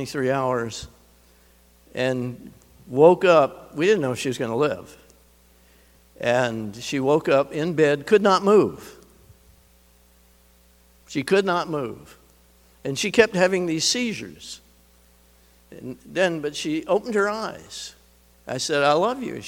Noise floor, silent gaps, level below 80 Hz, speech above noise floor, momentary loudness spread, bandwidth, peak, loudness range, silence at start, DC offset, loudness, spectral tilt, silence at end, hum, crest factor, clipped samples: -56 dBFS; none; -58 dBFS; 34 dB; 19 LU; 18.5 kHz; 0 dBFS; 7 LU; 0 s; under 0.1%; -22 LUFS; -4.5 dB/octave; 0 s; 60 Hz at -55 dBFS; 24 dB; under 0.1%